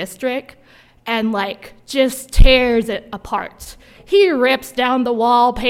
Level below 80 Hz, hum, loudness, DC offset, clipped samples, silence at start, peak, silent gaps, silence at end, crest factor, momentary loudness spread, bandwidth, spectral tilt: -22 dBFS; none; -17 LUFS; under 0.1%; under 0.1%; 0 s; 0 dBFS; none; 0 s; 16 dB; 15 LU; 15.5 kHz; -5 dB/octave